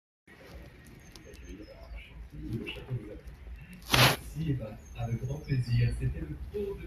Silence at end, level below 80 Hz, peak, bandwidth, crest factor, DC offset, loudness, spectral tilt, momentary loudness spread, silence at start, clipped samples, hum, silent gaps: 0 s; -44 dBFS; -4 dBFS; 15.5 kHz; 30 dB; under 0.1%; -31 LUFS; -4.5 dB/octave; 25 LU; 0.3 s; under 0.1%; none; none